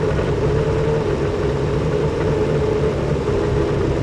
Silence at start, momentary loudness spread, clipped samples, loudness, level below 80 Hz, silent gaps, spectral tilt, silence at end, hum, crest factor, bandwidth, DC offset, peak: 0 s; 2 LU; under 0.1%; -19 LUFS; -30 dBFS; none; -7.5 dB/octave; 0 s; none; 12 dB; 11.5 kHz; under 0.1%; -6 dBFS